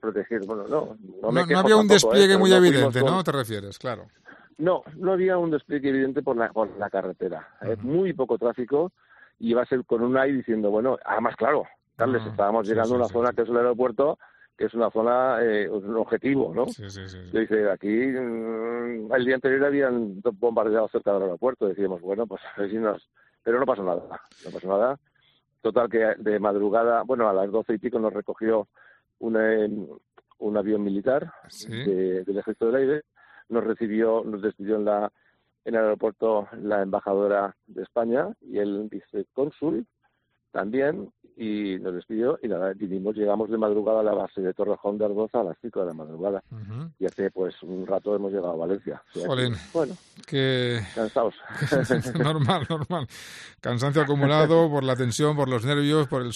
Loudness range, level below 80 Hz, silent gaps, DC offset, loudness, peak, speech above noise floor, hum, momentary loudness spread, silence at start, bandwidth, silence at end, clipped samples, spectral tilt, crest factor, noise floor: 6 LU; -64 dBFS; none; under 0.1%; -25 LUFS; -4 dBFS; 48 dB; none; 11 LU; 0.05 s; 13 kHz; 0 s; under 0.1%; -6 dB/octave; 22 dB; -72 dBFS